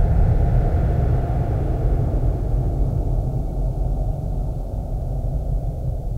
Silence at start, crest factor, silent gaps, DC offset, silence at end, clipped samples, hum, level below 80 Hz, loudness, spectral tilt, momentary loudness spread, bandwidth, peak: 0 s; 14 dB; none; under 0.1%; 0 s; under 0.1%; none; -22 dBFS; -23 LUFS; -10 dB/octave; 8 LU; 3.4 kHz; -6 dBFS